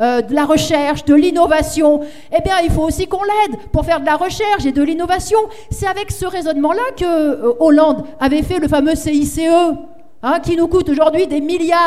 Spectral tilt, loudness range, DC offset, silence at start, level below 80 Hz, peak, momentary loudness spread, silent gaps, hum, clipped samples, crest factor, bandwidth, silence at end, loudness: -5.5 dB/octave; 3 LU; 2%; 0 s; -32 dBFS; 0 dBFS; 7 LU; none; none; under 0.1%; 14 dB; 15 kHz; 0 s; -15 LUFS